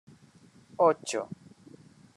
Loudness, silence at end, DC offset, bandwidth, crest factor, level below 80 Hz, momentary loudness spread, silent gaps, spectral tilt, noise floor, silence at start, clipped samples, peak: -28 LUFS; 0.8 s; under 0.1%; 12.5 kHz; 22 dB; -80 dBFS; 23 LU; none; -4 dB/octave; -58 dBFS; 0.8 s; under 0.1%; -10 dBFS